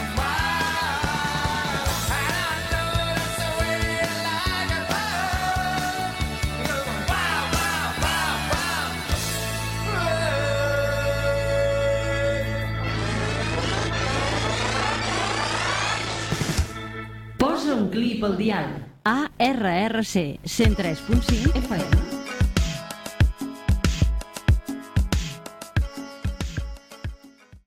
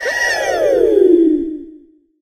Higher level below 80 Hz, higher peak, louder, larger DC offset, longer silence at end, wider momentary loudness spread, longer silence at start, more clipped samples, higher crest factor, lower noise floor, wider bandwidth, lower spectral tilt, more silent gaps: first, -32 dBFS vs -46 dBFS; second, -6 dBFS vs 0 dBFS; second, -24 LUFS vs -13 LUFS; neither; second, 0.1 s vs 0.45 s; second, 6 LU vs 12 LU; about the same, 0 s vs 0 s; neither; about the same, 18 dB vs 14 dB; first, -49 dBFS vs -44 dBFS; about the same, 16.5 kHz vs 15 kHz; about the same, -4.5 dB/octave vs -3.5 dB/octave; neither